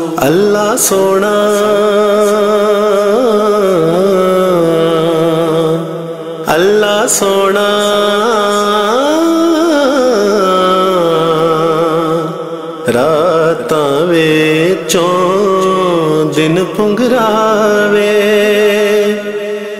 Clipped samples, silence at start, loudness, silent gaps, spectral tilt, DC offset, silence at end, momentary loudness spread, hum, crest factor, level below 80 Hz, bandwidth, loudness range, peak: under 0.1%; 0 s; -10 LUFS; none; -4.5 dB/octave; 0.6%; 0 s; 3 LU; none; 10 dB; -52 dBFS; 16 kHz; 1 LU; 0 dBFS